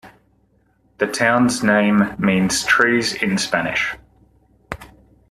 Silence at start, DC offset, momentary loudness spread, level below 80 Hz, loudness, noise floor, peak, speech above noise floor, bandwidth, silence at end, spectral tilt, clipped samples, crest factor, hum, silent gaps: 0.05 s; under 0.1%; 19 LU; -50 dBFS; -17 LUFS; -60 dBFS; -2 dBFS; 43 dB; 13.5 kHz; 0.45 s; -4 dB/octave; under 0.1%; 18 dB; none; none